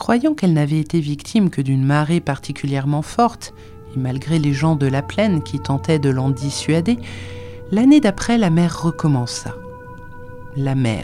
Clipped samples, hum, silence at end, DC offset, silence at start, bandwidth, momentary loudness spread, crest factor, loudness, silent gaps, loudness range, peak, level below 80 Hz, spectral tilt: under 0.1%; none; 0 s; under 0.1%; 0 s; 12.5 kHz; 17 LU; 16 dB; -18 LUFS; none; 2 LU; -2 dBFS; -44 dBFS; -6.5 dB/octave